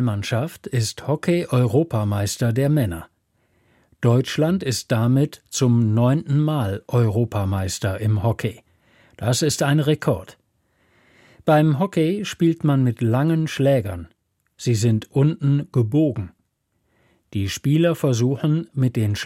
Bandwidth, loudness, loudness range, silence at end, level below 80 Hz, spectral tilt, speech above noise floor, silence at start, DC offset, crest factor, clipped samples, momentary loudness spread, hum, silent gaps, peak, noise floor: 16 kHz; -21 LUFS; 3 LU; 0 s; -52 dBFS; -6.5 dB/octave; 50 dB; 0 s; under 0.1%; 16 dB; under 0.1%; 7 LU; none; none; -4 dBFS; -70 dBFS